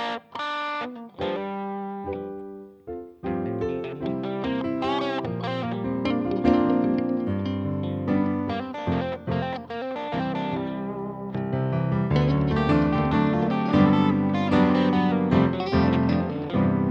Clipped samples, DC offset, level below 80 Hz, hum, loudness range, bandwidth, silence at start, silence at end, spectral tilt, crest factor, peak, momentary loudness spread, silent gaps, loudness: under 0.1%; under 0.1%; -46 dBFS; none; 10 LU; 7.2 kHz; 0 s; 0 s; -8.5 dB/octave; 18 dB; -6 dBFS; 11 LU; none; -25 LUFS